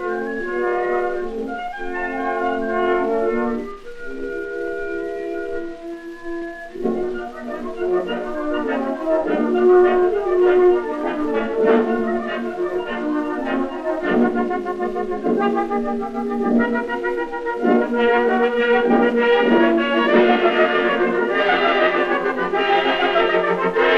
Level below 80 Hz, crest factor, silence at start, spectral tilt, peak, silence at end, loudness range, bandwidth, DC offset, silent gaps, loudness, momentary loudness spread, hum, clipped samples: -44 dBFS; 18 dB; 0 s; -6 dB/octave; -2 dBFS; 0 s; 10 LU; 7.2 kHz; under 0.1%; none; -19 LUFS; 12 LU; none; under 0.1%